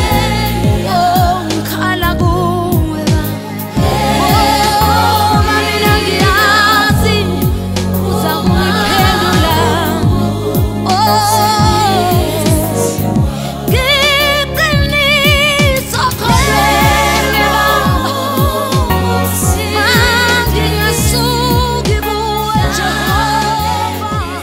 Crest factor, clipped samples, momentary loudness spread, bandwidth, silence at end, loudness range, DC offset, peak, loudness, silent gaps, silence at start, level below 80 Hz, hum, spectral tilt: 12 dB; under 0.1%; 6 LU; 16.5 kHz; 0 s; 3 LU; under 0.1%; 0 dBFS; -11 LUFS; none; 0 s; -22 dBFS; none; -4.5 dB/octave